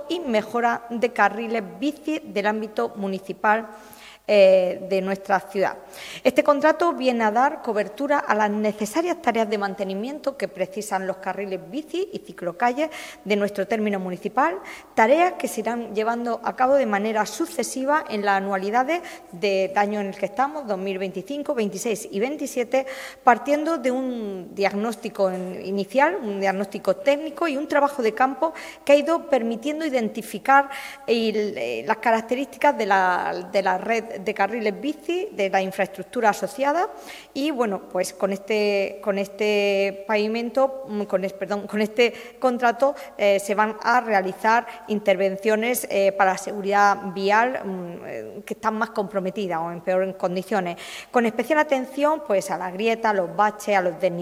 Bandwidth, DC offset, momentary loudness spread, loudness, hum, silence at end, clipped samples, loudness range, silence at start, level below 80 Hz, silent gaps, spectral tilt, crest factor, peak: 16 kHz; under 0.1%; 9 LU; -23 LUFS; none; 0 s; under 0.1%; 4 LU; 0 s; -66 dBFS; none; -4.5 dB/octave; 22 dB; -2 dBFS